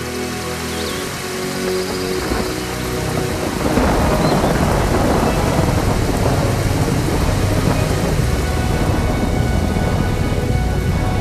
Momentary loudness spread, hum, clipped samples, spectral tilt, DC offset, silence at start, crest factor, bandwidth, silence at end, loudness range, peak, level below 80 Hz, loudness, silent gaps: 6 LU; none; under 0.1%; -5.5 dB/octave; under 0.1%; 0 s; 16 dB; 14 kHz; 0 s; 4 LU; -2 dBFS; -24 dBFS; -18 LUFS; none